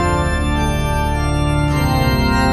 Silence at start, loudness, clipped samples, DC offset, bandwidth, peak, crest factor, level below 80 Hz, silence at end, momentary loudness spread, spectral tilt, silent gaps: 0 s; -17 LUFS; under 0.1%; under 0.1%; 13.5 kHz; -2 dBFS; 12 dB; -22 dBFS; 0 s; 3 LU; -6 dB/octave; none